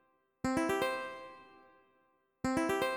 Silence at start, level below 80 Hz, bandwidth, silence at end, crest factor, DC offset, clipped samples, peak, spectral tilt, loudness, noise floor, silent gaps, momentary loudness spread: 0.45 s; -62 dBFS; 18.5 kHz; 0 s; 18 dB; under 0.1%; under 0.1%; -20 dBFS; -4.5 dB/octave; -35 LUFS; -74 dBFS; none; 18 LU